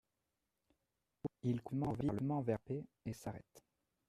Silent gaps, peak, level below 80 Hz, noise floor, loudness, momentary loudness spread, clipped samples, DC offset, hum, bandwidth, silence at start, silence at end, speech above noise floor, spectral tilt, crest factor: none; -24 dBFS; -68 dBFS; -88 dBFS; -42 LUFS; 11 LU; under 0.1%; under 0.1%; none; 14 kHz; 1.25 s; 0.5 s; 47 dB; -8.5 dB/octave; 20 dB